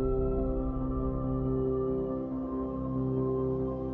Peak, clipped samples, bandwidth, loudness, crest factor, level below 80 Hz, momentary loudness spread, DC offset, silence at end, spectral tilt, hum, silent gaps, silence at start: -18 dBFS; under 0.1%; 3.3 kHz; -32 LUFS; 12 dB; -38 dBFS; 4 LU; under 0.1%; 0 s; -13 dB/octave; none; none; 0 s